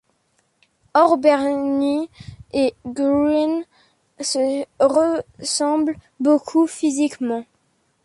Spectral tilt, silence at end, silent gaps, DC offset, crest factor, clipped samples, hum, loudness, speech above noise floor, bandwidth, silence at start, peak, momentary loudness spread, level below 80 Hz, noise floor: -3.5 dB/octave; 0.6 s; none; under 0.1%; 18 dB; under 0.1%; none; -20 LUFS; 47 dB; 11.5 kHz; 0.95 s; -2 dBFS; 9 LU; -56 dBFS; -66 dBFS